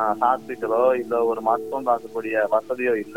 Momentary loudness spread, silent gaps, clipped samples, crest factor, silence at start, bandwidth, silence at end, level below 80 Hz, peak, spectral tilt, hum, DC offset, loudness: 5 LU; none; under 0.1%; 16 dB; 0 s; 17 kHz; 0 s; -68 dBFS; -6 dBFS; -6 dB/octave; none; 0.3%; -23 LUFS